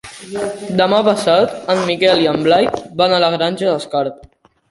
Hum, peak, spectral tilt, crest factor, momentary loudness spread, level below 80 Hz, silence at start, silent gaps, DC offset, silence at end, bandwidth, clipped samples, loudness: none; -2 dBFS; -5 dB/octave; 14 dB; 10 LU; -54 dBFS; 0.05 s; none; under 0.1%; 0.55 s; 11.5 kHz; under 0.1%; -15 LUFS